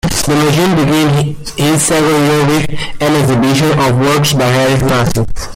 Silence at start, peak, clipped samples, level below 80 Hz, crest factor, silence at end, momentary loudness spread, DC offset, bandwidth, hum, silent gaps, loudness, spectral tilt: 0.05 s; -2 dBFS; under 0.1%; -30 dBFS; 10 dB; 0 s; 5 LU; under 0.1%; 16.5 kHz; none; none; -11 LUFS; -5 dB/octave